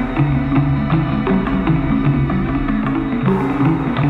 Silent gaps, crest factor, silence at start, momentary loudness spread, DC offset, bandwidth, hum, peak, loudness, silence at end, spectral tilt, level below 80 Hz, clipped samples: none; 12 dB; 0 s; 2 LU; under 0.1%; 4.7 kHz; none; -4 dBFS; -17 LUFS; 0 s; -10 dB/octave; -28 dBFS; under 0.1%